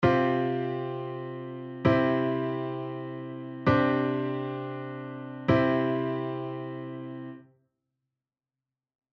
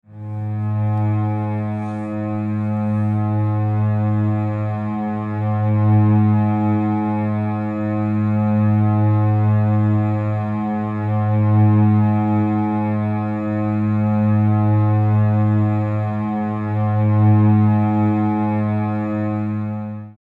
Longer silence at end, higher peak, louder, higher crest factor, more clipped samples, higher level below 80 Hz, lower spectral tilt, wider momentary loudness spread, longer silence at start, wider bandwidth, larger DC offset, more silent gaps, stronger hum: first, 1.75 s vs 0.1 s; second, -10 dBFS vs -6 dBFS; second, -29 LUFS vs -19 LUFS; first, 20 dB vs 12 dB; neither; about the same, -58 dBFS vs -58 dBFS; second, -9 dB/octave vs -11.5 dB/octave; first, 15 LU vs 8 LU; about the same, 0 s vs 0.1 s; first, 6.2 kHz vs 3.7 kHz; neither; neither; neither